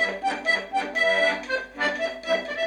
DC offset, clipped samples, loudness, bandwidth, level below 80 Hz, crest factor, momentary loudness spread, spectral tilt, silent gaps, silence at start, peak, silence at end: under 0.1%; under 0.1%; -24 LUFS; 11.5 kHz; -60 dBFS; 14 dB; 7 LU; -2.5 dB/octave; none; 0 s; -10 dBFS; 0 s